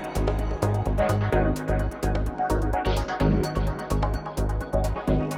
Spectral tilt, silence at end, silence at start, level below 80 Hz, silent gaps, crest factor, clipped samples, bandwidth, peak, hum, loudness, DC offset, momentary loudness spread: -7 dB/octave; 0 s; 0 s; -28 dBFS; none; 16 dB; under 0.1%; 15 kHz; -10 dBFS; none; -26 LUFS; under 0.1%; 4 LU